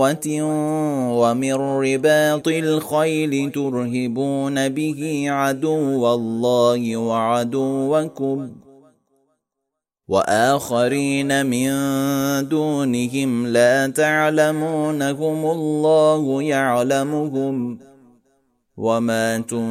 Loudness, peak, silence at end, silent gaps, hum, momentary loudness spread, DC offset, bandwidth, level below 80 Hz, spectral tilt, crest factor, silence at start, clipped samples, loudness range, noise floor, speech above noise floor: -19 LUFS; -4 dBFS; 0 s; none; none; 6 LU; under 0.1%; 16 kHz; -64 dBFS; -5 dB/octave; 16 dB; 0 s; under 0.1%; 4 LU; -80 dBFS; 61 dB